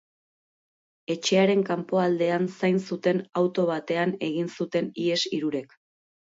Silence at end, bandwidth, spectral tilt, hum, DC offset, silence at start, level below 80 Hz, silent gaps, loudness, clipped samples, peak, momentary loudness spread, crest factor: 0.65 s; 7.8 kHz; -5.5 dB/octave; none; under 0.1%; 1.1 s; -74 dBFS; none; -26 LUFS; under 0.1%; -10 dBFS; 7 LU; 16 dB